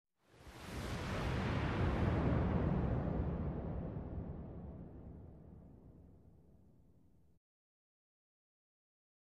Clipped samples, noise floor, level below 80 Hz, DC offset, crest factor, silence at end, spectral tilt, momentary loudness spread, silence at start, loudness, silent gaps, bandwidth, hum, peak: under 0.1%; -69 dBFS; -48 dBFS; under 0.1%; 18 dB; 3 s; -7.5 dB/octave; 22 LU; 0.35 s; -39 LUFS; none; 13 kHz; none; -22 dBFS